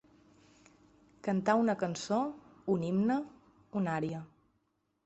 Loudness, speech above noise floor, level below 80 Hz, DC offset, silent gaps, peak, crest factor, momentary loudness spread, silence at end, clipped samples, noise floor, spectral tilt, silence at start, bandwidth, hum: -33 LUFS; 47 dB; -72 dBFS; under 0.1%; none; -14 dBFS; 20 dB; 12 LU; 0.8 s; under 0.1%; -78 dBFS; -6.5 dB/octave; 1.25 s; 8.2 kHz; none